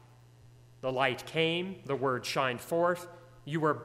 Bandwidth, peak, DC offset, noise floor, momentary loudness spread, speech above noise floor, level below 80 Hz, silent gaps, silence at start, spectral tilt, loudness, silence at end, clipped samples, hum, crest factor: 16 kHz; -10 dBFS; under 0.1%; -57 dBFS; 8 LU; 26 dB; -68 dBFS; none; 0.45 s; -5 dB/octave; -32 LUFS; 0 s; under 0.1%; none; 22 dB